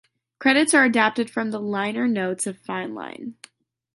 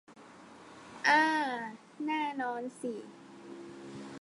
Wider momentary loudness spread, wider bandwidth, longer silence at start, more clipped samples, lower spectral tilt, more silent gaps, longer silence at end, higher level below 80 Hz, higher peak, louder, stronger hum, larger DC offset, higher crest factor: second, 17 LU vs 26 LU; about the same, 11.5 kHz vs 11.5 kHz; first, 0.4 s vs 0.1 s; neither; about the same, -3.5 dB/octave vs -3.5 dB/octave; neither; first, 0.65 s vs 0 s; first, -72 dBFS vs -80 dBFS; first, -4 dBFS vs -12 dBFS; first, -21 LUFS vs -31 LUFS; neither; neither; about the same, 20 dB vs 22 dB